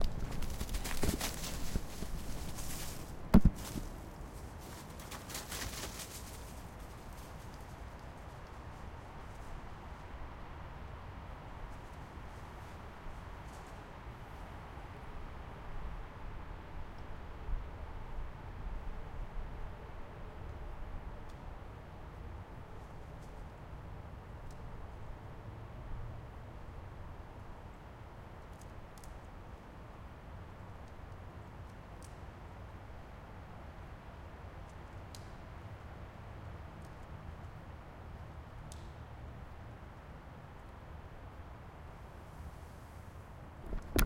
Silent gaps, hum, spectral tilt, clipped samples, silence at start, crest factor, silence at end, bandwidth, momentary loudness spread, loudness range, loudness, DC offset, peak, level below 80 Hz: none; none; -5 dB/octave; under 0.1%; 0 s; 32 dB; 0 s; 16.5 kHz; 10 LU; 15 LU; -46 LUFS; under 0.1%; -10 dBFS; -46 dBFS